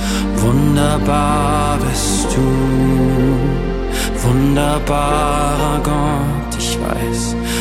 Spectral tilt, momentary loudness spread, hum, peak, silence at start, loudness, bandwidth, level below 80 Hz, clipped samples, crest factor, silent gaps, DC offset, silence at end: -5.5 dB/octave; 5 LU; none; 0 dBFS; 0 s; -16 LUFS; 16 kHz; -22 dBFS; under 0.1%; 14 dB; none; under 0.1%; 0 s